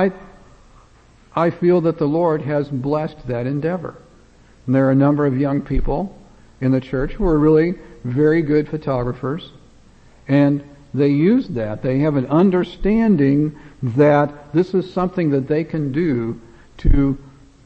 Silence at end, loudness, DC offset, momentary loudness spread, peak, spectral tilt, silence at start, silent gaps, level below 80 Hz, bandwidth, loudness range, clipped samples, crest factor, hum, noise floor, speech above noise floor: 0.35 s; -19 LUFS; under 0.1%; 10 LU; 0 dBFS; -10 dB/octave; 0 s; none; -30 dBFS; 6.6 kHz; 3 LU; under 0.1%; 18 dB; none; -49 dBFS; 32 dB